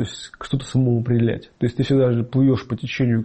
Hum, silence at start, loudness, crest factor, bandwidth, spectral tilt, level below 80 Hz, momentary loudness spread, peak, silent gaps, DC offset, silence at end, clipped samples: none; 0 s; -21 LUFS; 12 dB; 8.6 kHz; -7.5 dB/octave; -48 dBFS; 9 LU; -8 dBFS; none; under 0.1%; 0 s; under 0.1%